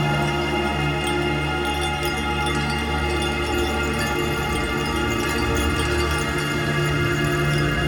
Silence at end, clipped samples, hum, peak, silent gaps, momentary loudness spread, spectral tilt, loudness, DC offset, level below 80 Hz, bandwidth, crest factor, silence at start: 0 s; under 0.1%; none; -8 dBFS; none; 2 LU; -5 dB/octave; -22 LUFS; under 0.1%; -32 dBFS; over 20 kHz; 14 dB; 0 s